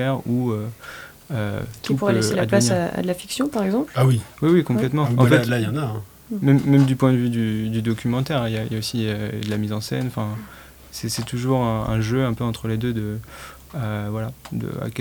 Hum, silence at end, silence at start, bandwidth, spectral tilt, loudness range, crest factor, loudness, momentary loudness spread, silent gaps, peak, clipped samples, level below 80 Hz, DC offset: none; 0 s; 0 s; over 20 kHz; -6.5 dB/octave; 6 LU; 20 dB; -22 LUFS; 13 LU; none; -2 dBFS; under 0.1%; -48 dBFS; under 0.1%